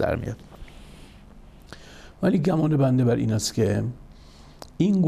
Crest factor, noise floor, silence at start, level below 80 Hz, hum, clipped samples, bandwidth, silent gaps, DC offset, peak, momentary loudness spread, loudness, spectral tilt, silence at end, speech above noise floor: 14 dB; -47 dBFS; 0 s; -46 dBFS; none; under 0.1%; 14.5 kHz; none; under 0.1%; -10 dBFS; 25 LU; -23 LUFS; -6.5 dB/octave; 0 s; 25 dB